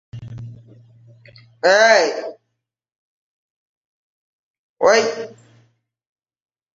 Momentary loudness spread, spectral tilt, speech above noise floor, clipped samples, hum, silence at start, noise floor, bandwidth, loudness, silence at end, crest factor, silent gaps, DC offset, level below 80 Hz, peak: 24 LU; -2.5 dB/octave; 62 dB; under 0.1%; none; 0.15 s; -77 dBFS; 7.8 kHz; -15 LUFS; 1.45 s; 20 dB; 2.98-4.76 s; under 0.1%; -60 dBFS; -2 dBFS